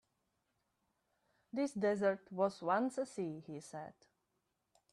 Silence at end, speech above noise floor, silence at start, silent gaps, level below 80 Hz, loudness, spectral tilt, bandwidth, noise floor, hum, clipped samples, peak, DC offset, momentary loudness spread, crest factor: 1 s; 47 dB; 1.55 s; none; -82 dBFS; -38 LUFS; -6 dB/octave; 12 kHz; -85 dBFS; none; under 0.1%; -22 dBFS; under 0.1%; 15 LU; 20 dB